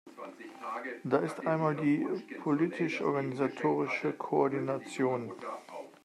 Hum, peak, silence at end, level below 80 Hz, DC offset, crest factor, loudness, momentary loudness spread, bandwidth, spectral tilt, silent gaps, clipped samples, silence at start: none; -12 dBFS; 0.15 s; -80 dBFS; under 0.1%; 20 dB; -32 LUFS; 13 LU; 12 kHz; -7 dB/octave; none; under 0.1%; 0.05 s